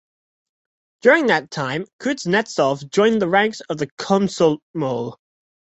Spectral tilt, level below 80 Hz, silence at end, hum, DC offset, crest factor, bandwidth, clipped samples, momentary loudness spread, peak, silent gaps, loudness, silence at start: -5 dB/octave; -62 dBFS; 0.65 s; none; under 0.1%; 18 dB; 8.2 kHz; under 0.1%; 10 LU; -2 dBFS; 1.93-1.99 s, 3.92-3.97 s, 4.62-4.74 s; -19 LUFS; 1.05 s